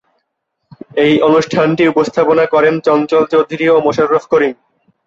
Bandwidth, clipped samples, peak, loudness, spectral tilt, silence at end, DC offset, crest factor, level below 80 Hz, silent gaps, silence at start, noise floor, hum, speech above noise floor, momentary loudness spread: 7.6 kHz; under 0.1%; 0 dBFS; -12 LUFS; -6 dB/octave; 0.55 s; under 0.1%; 12 dB; -54 dBFS; none; 0.95 s; -71 dBFS; none; 60 dB; 3 LU